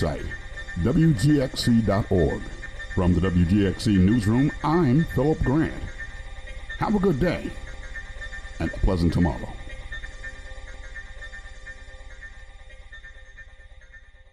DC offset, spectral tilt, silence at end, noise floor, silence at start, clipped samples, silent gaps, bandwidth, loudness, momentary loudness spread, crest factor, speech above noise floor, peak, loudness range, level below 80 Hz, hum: under 0.1%; -7 dB/octave; 0.3 s; -47 dBFS; 0 s; under 0.1%; none; 14 kHz; -23 LUFS; 21 LU; 14 dB; 26 dB; -10 dBFS; 19 LU; -36 dBFS; none